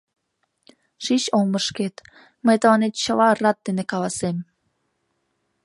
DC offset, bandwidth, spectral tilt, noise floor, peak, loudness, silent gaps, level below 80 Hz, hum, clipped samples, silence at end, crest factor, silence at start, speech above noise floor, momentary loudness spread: under 0.1%; 11.5 kHz; -4.5 dB/octave; -73 dBFS; -4 dBFS; -21 LUFS; none; -64 dBFS; none; under 0.1%; 1.2 s; 20 dB; 1 s; 52 dB; 11 LU